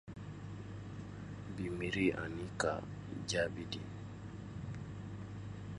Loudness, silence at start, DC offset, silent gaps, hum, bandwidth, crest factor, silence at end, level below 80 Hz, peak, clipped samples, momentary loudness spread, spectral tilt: -41 LUFS; 0.05 s; under 0.1%; none; none; 11.5 kHz; 22 dB; 0 s; -58 dBFS; -20 dBFS; under 0.1%; 13 LU; -5 dB/octave